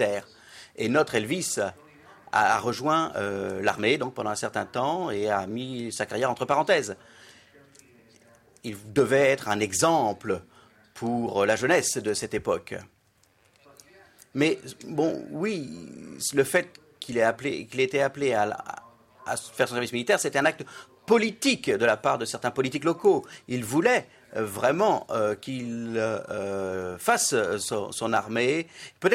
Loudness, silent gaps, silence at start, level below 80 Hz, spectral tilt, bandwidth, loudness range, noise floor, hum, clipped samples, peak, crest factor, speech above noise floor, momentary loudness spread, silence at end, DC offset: -26 LUFS; none; 0 s; -66 dBFS; -4 dB/octave; 16 kHz; 4 LU; -64 dBFS; none; under 0.1%; -8 dBFS; 18 dB; 38 dB; 12 LU; 0 s; under 0.1%